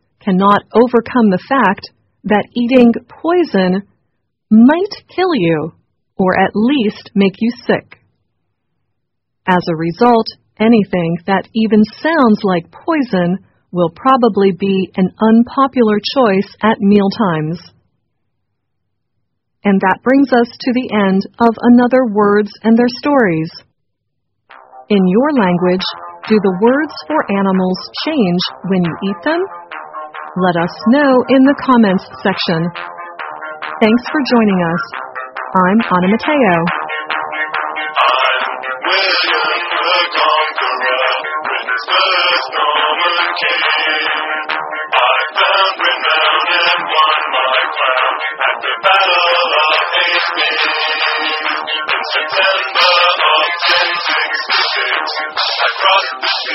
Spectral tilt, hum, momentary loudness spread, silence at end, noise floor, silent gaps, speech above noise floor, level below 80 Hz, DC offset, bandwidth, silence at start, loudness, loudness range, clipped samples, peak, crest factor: -3 dB/octave; none; 8 LU; 0 s; -74 dBFS; none; 61 dB; -54 dBFS; under 0.1%; 6 kHz; 0.25 s; -13 LUFS; 4 LU; under 0.1%; 0 dBFS; 14 dB